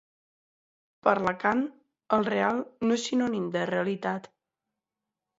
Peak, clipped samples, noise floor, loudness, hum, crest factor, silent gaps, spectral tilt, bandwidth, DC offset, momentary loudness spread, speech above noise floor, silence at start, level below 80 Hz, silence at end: -8 dBFS; under 0.1%; -88 dBFS; -28 LUFS; none; 22 dB; none; -5.5 dB/octave; 8 kHz; under 0.1%; 6 LU; 61 dB; 1.05 s; -68 dBFS; 1.1 s